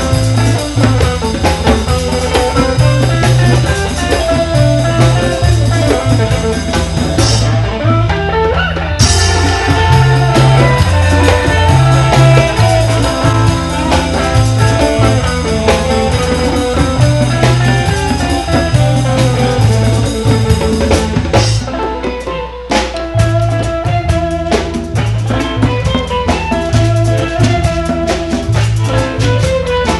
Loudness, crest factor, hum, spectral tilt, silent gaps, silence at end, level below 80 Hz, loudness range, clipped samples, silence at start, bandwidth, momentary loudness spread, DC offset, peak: -12 LUFS; 10 dB; none; -5.5 dB/octave; none; 0 s; -20 dBFS; 5 LU; 0.1%; 0 s; 12 kHz; 6 LU; under 0.1%; 0 dBFS